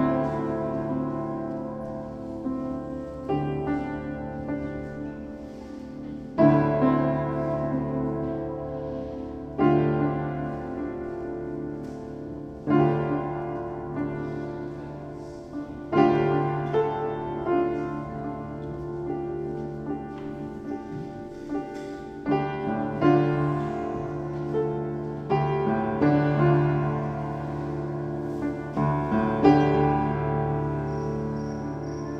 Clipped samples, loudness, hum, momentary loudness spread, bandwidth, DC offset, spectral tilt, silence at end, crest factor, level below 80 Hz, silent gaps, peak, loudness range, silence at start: under 0.1%; -27 LUFS; none; 14 LU; 6.6 kHz; under 0.1%; -9.5 dB/octave; 0 s; 22 dB; -48 dBFS; none; -4 dBFS; 7 LU; 0 s